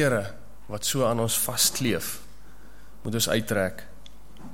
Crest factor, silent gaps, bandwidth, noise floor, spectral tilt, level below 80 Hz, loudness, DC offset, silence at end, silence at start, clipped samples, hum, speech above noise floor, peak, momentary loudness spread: 20 dB; none; 16.5 kHz; -50 dBFS; -3 dB/octave; -52 dBFS; -25 LUFS; 1%; 0 s; 0 s; under 0.1%; none; 24 dB; -8 dBFS; 17 LU